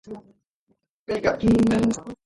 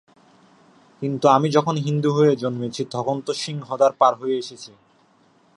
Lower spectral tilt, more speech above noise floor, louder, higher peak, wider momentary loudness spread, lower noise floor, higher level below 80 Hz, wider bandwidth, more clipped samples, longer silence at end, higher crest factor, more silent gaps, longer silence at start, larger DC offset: about the same, -6.5 dB/octave vs -6.5 dB/octave; first, 48 dB vs 38 dB; about the same, -22 LUFS vs -21 LUFS; second, -8 dBFS vs -2 dBFS; first, 20 LU vs 12 LU; first, -70 dBFS vs -58 dBFS; first, -44 dBFS vs -68 dBFS; about the same, 11.5 kHz vs 11.5 kHz; neither; second, 0.1 s vs 0.9 s; about the same, 16 dB vs 20 dB; first, 0.47-0.67 s, 0.89-1.06 s vs none; second, 0.05 s vs 1 s; neither